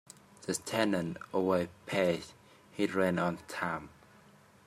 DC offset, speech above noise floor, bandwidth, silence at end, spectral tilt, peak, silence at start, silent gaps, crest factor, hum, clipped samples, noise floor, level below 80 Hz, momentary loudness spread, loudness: under 0.1%; 28 dB; 15 kHz; 0.8 s; -5 dB/octave; -12 dBFS; 0.4 s; none; 22 dB; none; under 0.1%; -60 dBFS; -70 dBFS; 13 LU; -33 LUFS